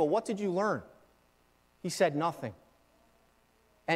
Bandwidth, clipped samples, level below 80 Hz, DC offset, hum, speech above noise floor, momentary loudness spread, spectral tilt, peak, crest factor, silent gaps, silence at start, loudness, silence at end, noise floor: 16 kHz; under 0.1%; -74 dBFS; under 0.1%; 60 Hz at -60 dBFS; 37 dB; 14 LU; -5 dB/octave; -14 dBFS; 20 dB; none; 0 s; -33 LUFS; 0 s; -68 dBFS